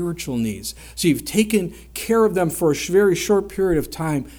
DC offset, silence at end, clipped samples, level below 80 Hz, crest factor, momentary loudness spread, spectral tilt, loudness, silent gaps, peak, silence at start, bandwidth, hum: under 0.1%; 0 s; under 0.1%; -42 dBFS; 16 dB; 9 LU; -5 dB/octave; -20 LUFS; none; -4 dBFS; 0 s; over 20 kHz; none